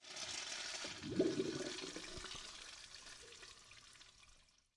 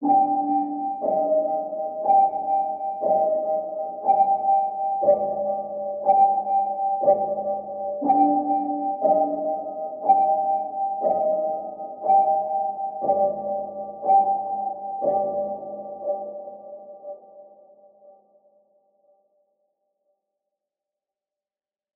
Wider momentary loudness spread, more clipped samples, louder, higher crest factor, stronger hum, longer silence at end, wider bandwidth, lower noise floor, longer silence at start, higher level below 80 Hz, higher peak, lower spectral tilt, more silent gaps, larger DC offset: first, 20 LU vs 12 LU; neither; second, -45 LUFS vs -23 LUFS; about the same, 22 dB vs 18 dB; neither; second, 0.3 s vs 3.85 s; first, 11.5 kHz vs 2.5 kHz; second, -69 dBFS vs under -90 dBFS; about the same, 0 s vs 0 s; about the same, -68 dBFS vs -70 dBFS; second, -24 dBFS vs -6 dBFS; second, -3 dB/octave vs -12 dB/octave; neither; neither